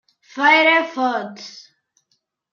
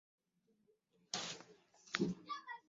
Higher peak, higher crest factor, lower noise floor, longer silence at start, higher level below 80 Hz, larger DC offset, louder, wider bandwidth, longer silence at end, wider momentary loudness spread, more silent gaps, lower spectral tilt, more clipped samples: first, -2 dBFS vs -16 dBFS; second, 18 dB vs 32 dB; second, -70 dBFS vs -80 dBFS; second, 0.35 s vs 1.15 s; about the same, -82 dBFS vs -80 dBFS; neither; first, -16 LUFS vs -44 LUFS; about the same, 7.2 kHz vs 7.6 kHz; first, 1 s vs 0.1 s; first, 24 LU vs 11 LU; neither; about the same, -3 dB/octave vs -3 dB/octave; neither